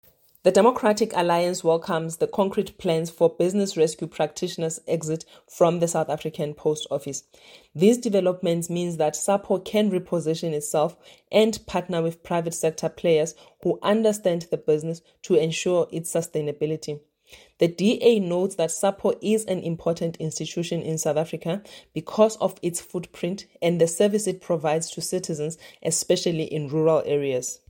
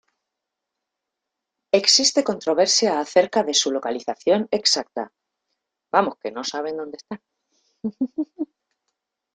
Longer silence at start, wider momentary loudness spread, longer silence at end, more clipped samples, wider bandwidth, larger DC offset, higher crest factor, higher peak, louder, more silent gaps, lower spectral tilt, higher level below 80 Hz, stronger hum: second, 0.45 s vs 1.75 s; second, 10 LU vs 18 LU; second, 0.15 s vs 0.9 s; neither; first, 17 kHz vs 11 kHz; neither; about the same, 20 dB vs 22 dB; about the same, -4 dBFS vs -2 dBFS; second, -24 LUFS vs -20 LUFS; neither; first, -5 dB/octave vs -2 dB/octave; first, -62 dBFS vs -70 dBFS; neither